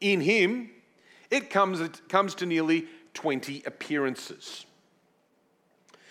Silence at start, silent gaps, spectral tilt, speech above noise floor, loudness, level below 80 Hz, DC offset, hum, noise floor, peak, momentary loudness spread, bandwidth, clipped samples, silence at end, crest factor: 0 s; none; -4.5 dB/octave; 41 dB; -27 LUFS; -88 dBFS; under 0.1%; none; -68 dBFS; -8 dBFS; 18 LU; 15 kHz; under 0.1%; 1.45 s; 22 dB